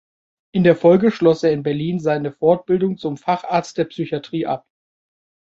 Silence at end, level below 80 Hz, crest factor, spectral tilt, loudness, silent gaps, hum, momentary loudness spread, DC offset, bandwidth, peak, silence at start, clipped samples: 0.9 s; -58 dBFS; 18 dB; -7.5 dB/octave; -19 LUFS; none; none; 11 LU; under 0.1%; 7.8 kHz; -2 dBFS; 0.55 s; under 0.1%